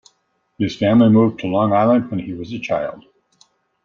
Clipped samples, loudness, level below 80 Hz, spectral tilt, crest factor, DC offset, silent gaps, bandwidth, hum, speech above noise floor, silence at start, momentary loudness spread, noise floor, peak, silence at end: under 0.1%; -17 LUFS; -56 dBFS; -8 dB/octave; 16 dB; under 0.1%; none; 7 kHz; none; 50 dB; 0.6 s; 14 LU; -67 dBFS; -2 dBFS; 0.85 s